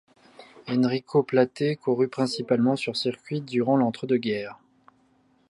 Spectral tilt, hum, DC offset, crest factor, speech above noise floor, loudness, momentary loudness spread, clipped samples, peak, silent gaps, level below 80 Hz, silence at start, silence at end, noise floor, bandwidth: -6.5 dB/octave; none; under 0.1%; 18 dB; 39 dB; -25 LUFS; 7 LU; under 0.1%; -8 dBFS; none; -72 dBFS; 0.4 s; 0.95 s; -64 dBFS; 11.5 kHz